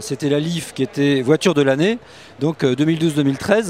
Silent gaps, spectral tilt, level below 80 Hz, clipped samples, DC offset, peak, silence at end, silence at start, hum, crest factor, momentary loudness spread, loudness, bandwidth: none; -6 dB/octave; -58 dBFS; under 0.1%; 0.1%; -2 dBFS; 0 s; 0 s; none; 16 dB; 8 LU; -18 LUFS; 15 kHz